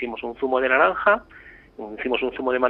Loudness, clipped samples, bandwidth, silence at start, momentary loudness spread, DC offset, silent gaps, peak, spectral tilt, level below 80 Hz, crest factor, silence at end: -22 LUFS; under 0.1%; 4.4 kHz; 0 s; 13 LU; under 0.1%; none; -4 dBFS; -7 dB/octave; -54 dBFS; 18 dB; 0 s